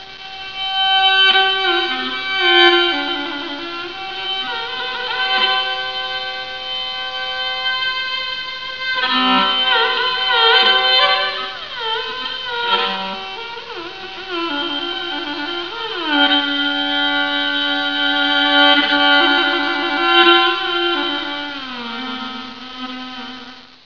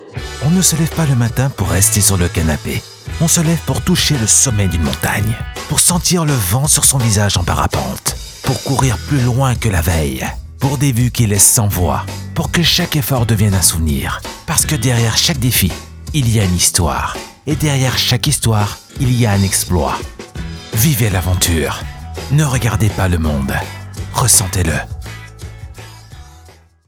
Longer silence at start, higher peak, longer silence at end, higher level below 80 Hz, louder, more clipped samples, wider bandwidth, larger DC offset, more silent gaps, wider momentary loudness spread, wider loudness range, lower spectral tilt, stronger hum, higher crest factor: about the same, 0 s vs 0 s; about the same, 0 dBFS vs 0 dBFS; second, 0.1 s vs 0.4 s; second, -56 dBFS vs -28 dBFS; about the same, -16 LUFS vs -14 LUFS; neither; second, 5.4 kHz vs over 20 kHz; first, 0.6% vs under 0.1%; neither; about the same, 16 LU vs 14 LU; first, 8 LU vs 4 LU; about the same, -3 dB/octave vs -3.5 dB/octave; neither; about the same, 18 dB vs 14 dB